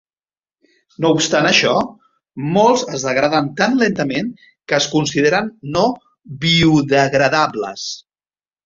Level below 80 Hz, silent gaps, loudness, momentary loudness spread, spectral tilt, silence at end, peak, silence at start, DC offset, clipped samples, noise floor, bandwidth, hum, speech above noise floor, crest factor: -50 dBFS; none; -16 LUFS; 14 LU; -4.5 dB/octave; 0.65 s; 0 dBFS; 1 s; under 0.1%; under 0.1%; under -90 dBFS; 7.8 kHz; none; over 74 dB; 16 dB